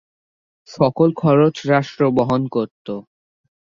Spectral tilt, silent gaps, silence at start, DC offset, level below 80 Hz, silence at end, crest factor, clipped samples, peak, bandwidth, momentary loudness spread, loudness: -8 dB/octave; 2.71-2.85 s; 0.7 s; under 0.1%; -54 dBFS; 0.8 s; 16 dB; under 0.1%; -2 dBFS; 7.4 kHz; 14 LU; -17 LUFS